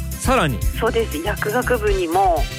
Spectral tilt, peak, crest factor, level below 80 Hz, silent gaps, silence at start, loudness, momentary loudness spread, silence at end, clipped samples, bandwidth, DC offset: -5 dB/octave; -6 dBFS; 14 dB; -26 dBFS; none; 0 s; -19 LUFS; 4 LU; 0 s; under 0.1%; 16 kHz; under 0.1%